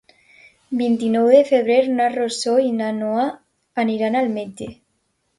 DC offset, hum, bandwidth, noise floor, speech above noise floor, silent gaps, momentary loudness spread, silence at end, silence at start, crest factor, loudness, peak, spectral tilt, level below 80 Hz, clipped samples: under 0.1%; none; 11.5 kHz; -69 dBFS; 51 dB; none; 14 LU; 0.65 s; 0.7 s; 18 dB; -19 LUFS; -2 dBFS; -5 dB/octave; -62 dBFS; under 0.1%